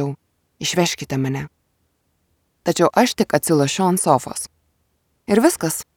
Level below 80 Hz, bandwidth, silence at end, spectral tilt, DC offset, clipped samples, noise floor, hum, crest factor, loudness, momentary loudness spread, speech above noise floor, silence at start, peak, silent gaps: -56 dBFS; 19.5 kHz; 0.15 s; -4.5 dB/octave; under 0.1%; under 0.1%; -67 dBFS; none; 20 dB; -19 LUFS; 13 LU; 49 dB; 0 s; 0 dBFS; none